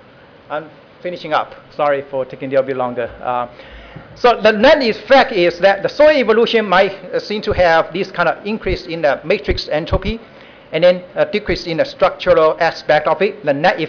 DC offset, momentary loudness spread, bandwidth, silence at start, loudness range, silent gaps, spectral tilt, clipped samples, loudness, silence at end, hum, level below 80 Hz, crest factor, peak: under 0.1%; 13 LU; 5.4 kHz; 0.5 s; 8 LU; none; -6 dB/octave; under 0.1%; -15 LUFS; 0 s; none; -36 dBFS; 12 dB; -4 dBFS